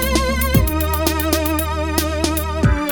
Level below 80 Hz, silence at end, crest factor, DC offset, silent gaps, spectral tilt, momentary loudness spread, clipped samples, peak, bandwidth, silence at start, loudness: -22 dBFS; 0 s; 16 dB; 0.6%; none; -5 dB/octave; 3 LU; under 0.1%; -2 dBFS; 17.5 kHz; 0 s; -18 LUFS